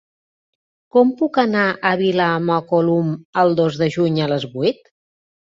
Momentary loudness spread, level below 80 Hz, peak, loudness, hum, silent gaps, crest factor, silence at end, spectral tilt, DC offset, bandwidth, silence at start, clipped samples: 5 LU; -60 dBFS; -2 dBFS; -18 LUFS; none; 3.25-3.33 s; 16 dB; 0.75 s; -7.5 dB/octave; under 0.1%; 7.6 kHz; 0.95 s; under 0.1%